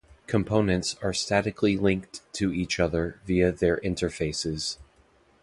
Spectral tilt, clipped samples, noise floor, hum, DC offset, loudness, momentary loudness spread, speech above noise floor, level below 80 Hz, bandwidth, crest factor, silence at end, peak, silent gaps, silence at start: -5 dB/octave; under 0.1%; -61 dBFS; none; under 0.1%; -27 LUFS; 7 LU; 35 dB; -44 dBFS; 11.5 kHz; 18 dB; 0.6 s; -8 dBFS; none; 0.3 s